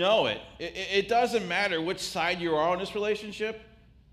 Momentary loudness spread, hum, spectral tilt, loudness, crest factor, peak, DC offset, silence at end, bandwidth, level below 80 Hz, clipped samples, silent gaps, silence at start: 10 LU; none; -3.5 dB/octave; -28 LUFS; 16 dB; -12 dBFS; under 0.1%; 0.5 s; 15.5 kHz; -58 dBFS; under 0.1%; none; 0 s